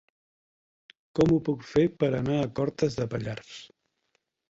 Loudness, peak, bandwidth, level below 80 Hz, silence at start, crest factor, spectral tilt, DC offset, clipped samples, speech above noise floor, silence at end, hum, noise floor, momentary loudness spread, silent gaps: -27 LUFS; -10 dBFS; 8 kHz; -54 dBFS; 1.15 s; 18 dB; -7.5 dB/octave; under 0.1%; under 0.1%; 49 dB; 0.85 s; none; -76 dBFS; 14 LU; none